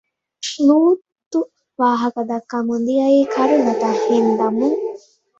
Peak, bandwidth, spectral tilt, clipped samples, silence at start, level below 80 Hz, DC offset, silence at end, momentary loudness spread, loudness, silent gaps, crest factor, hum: -4 dBFS; 8 kHz; -5 dB/octave; under 0.1%; 0.4 s; -64 dBFS; under 0.1%; 0.4 s; 10 LU; -17 LUFS; 1.26-1.31 s; 14 dB; none